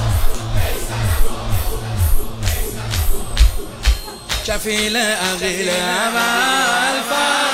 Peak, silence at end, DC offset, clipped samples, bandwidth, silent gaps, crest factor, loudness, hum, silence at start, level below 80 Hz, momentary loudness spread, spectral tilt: 0 dBFS; 0 s; under 0.1%; under 0.1%; 16 kHz; none; 16 dB; -18 LUFS; none; 0 s; -20 dBFS; 8 LU; -3.5 dB/octave